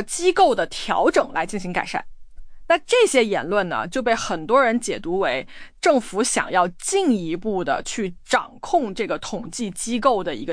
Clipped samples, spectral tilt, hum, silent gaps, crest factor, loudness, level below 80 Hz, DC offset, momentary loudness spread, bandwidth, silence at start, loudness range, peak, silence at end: under 0.1%; -3.5 dB/octave; none; none; 16 dB; -21 LUFS; -46 dBFS; under 0.1%; 10 LU; 10.5 kHz; 0 s; 3 LU; -4 dBFS; 0 s